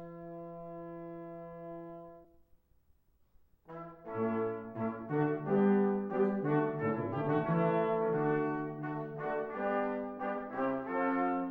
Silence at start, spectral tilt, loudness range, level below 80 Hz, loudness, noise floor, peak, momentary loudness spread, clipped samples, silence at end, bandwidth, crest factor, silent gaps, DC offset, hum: 0 s; -10.5 dB/octave; 17 LU; -70 dBFS; -33 LUFS; -69 dBFS; -18 dBFS; 16 LU; under 0.1%; 0 s; 4.7 kHz; 16 dB; none; under 0.1%; none